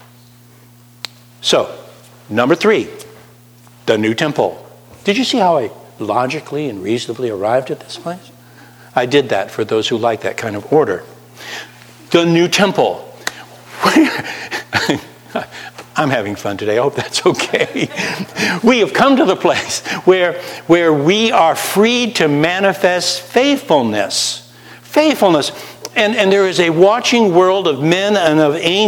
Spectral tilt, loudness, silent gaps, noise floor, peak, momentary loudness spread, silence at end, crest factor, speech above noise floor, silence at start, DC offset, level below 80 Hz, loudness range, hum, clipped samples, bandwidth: -4 dB/octave; -14 LUFS; none; -44 dBFS; 0 dBFS; 14 LU; 0 s; 16 dB; 30 dB; 1.4 s; under 0.1%; -58 dBFS; 6 LU; none; under 0.1%; 20 kHz